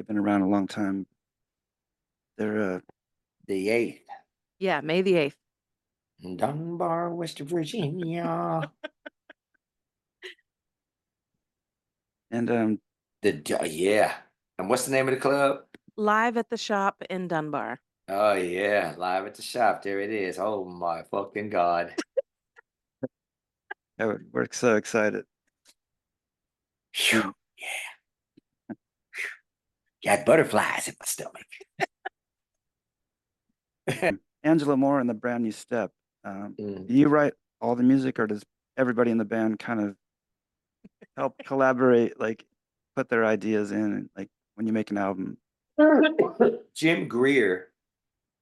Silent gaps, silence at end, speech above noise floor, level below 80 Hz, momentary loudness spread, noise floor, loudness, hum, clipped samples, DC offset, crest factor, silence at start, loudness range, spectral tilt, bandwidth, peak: none; 0.75 s; 64 dB; -72 dBFS; 18 LU; -90 dBFS; -26 LUFS; none; under 0.1%; under 0.1%; 22 dB; 0 s; 7 LU; -5 dB/octave; 12.5 kHz; -6 dBFS